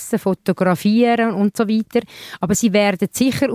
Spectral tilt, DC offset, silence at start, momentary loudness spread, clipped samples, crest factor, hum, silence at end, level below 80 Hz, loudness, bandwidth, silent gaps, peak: -5 dB/octave; under 0.1%; 0 s; 7 LU; under 0.1%; 14 dB; none; 0 s; -52 dBFS; -18 LUFS; 16 kHz; none; -4 dBFS